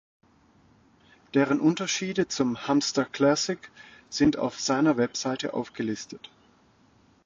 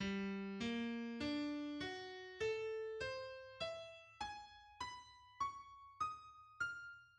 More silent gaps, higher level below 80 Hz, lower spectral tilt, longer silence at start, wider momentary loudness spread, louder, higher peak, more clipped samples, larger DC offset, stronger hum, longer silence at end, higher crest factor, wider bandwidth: neither; first, -60 dBFS vs -72 dBFS; about the same, -4.5 dB/octave vs -5 dB/octave; first, 1.35 s vs 0 s; about the same, 12 LU vs 13 LU; first, -26 LUFS vs -46 LUFS; first, -10 dBFS vs -32 dBFS; neither; neither; neither; first, 1.1 s vs 0 s; about the same, 18 dB vs 14 dB; second, 7.8 kHz vs 10.5 kHz